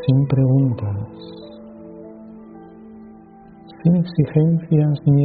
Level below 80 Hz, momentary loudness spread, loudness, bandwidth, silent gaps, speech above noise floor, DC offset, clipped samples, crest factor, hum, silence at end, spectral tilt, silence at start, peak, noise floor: -52 dBFS; 24 LU; -18 LUFS; 4.7 kHz; none; 27 dB; under 0.1%; under 0.1%; 16 dB; none; 0 s; -10.5 dB/octave; 0 s; -4 dBFS; -43 dBFS